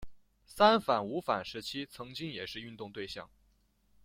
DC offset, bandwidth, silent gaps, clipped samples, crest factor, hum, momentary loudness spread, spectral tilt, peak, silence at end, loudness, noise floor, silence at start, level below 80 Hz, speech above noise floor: under 0.1%; 16.5 kHz; none; under 0.1%; 24 dB; none; 17 LU; -5 dB/octave; -10 dBFS; 0.8 s; -33 LUFS; -70 dBFS; 0 s; -64 dBFS; 38 dB